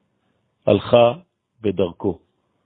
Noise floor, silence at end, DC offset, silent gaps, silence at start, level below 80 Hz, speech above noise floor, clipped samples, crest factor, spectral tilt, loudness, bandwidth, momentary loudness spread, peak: -68 dBFS; 0.5 s; under 0.1%; none; 0.65 s; -54 dBFS; 50 dB; under 0.1%; 20 dB; -11 dB/octave; -19 LUFS; 4.5 kHz; 14 LU; 0 dBFS